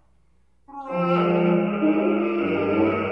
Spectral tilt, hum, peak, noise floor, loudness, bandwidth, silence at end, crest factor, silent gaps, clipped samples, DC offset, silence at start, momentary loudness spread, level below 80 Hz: -9.5 dB/octave; none; -8 dBFS; -64 dBFS; -22 LUFS; 5.6 kHz; 0 s; 14 dB; none; under 0.1%; under 0.1%; 0.7 s; 9 LU; -62 dBFS